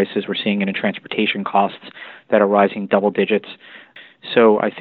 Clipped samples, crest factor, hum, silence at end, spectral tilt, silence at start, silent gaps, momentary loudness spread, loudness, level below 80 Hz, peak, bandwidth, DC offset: under 0.1%; 18 dB; none; 0 s; -10 dB/octave; 0 s; none; 21 LU; -18 LUFS; -66 dBFS; 0 dBFS; 4.6 kHz; under 0.1%